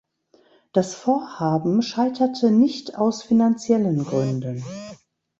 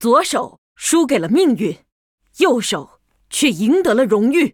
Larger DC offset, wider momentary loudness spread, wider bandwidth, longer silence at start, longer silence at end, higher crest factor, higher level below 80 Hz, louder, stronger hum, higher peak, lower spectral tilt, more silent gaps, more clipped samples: neither; about the same, 11 LU vs 10 LU; second, 7.8 kHz vs 19 kHz; first, 0.75 s vs 0 s; first, 0.45 s vs 0.05 s; about the same, 18 dB vs 16 dB; second, -62 dBFS vs -56 dBFS; second, -21 LUFS vs -16 LUFS; neither; second, -4 dBFS vs 0 dBFS; first, -7 dB/octave vs -4 dB/octave; second, none vs 0.58-0.75 s, 1.92-2.18 s; neither